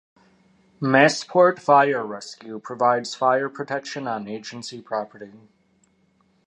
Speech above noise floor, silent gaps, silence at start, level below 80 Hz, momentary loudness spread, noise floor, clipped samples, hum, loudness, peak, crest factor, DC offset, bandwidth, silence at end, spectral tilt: 41 dB; none; 0.8 s; -74 dBFS; 18 LU; -63 dBFS; under 0.1%; none; -21 LUFS; -2 dBFS; 22 dB; under 0.1%; 10 kHz; 1.15 s; -4.5 dB/octave